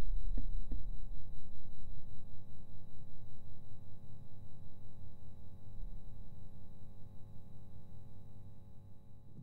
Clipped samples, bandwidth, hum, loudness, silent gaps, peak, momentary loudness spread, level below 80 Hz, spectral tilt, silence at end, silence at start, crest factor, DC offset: under 0.1%; 4.1 kHz; 50 Hz at -60 dBFS; -54 LUFS; none; -20 dBFS; 11 LU; -46 dBFS; -8.5 dB/octave; 0 s; 0 s; 12 dB; under 0.1%